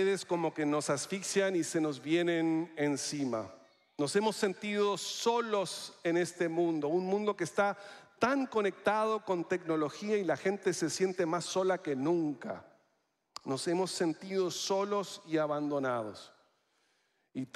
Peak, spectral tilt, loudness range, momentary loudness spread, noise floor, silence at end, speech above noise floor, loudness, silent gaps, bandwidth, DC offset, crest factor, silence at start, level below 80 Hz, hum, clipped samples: -14 dBFS; -4.5 dB/octave; 3 LU; 7 LU; -78 dBFS; 0.1 s; 45 dB; -33 LUFS; none; 14 kHz; under 0.1%; 18 dB; 0 s; -82 dBFS; none; under 0.1%